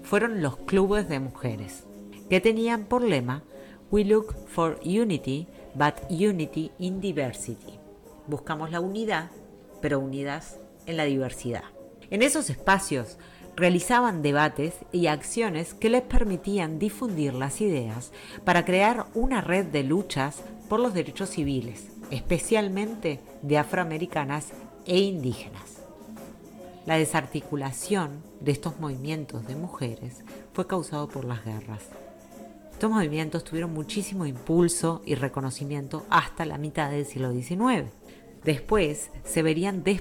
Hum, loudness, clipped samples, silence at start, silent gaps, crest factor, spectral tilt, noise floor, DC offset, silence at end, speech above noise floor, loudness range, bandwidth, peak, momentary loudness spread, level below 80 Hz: none; -27 LUFS; under 0.1%; 0 s; none; 18 dB; -5 dB/octave; -48 dBFS; under 0.1%; 0 s; 22 dB; 7 LU; 18.5 kHz; -8 dBFS; 17 LU; -42 dBFS